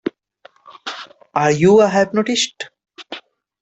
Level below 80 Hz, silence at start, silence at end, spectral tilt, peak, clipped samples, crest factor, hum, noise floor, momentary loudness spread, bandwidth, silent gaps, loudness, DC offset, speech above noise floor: -58 dBFS; 0.05 s; 0.4 s; -4.5 dB/octave; -2 dBFS; under 0.1%; 16 dB; none; -50 dBFS; 22 LU; 8.2 kHz; none; -15 LUFS; under 0.1%; 35 dB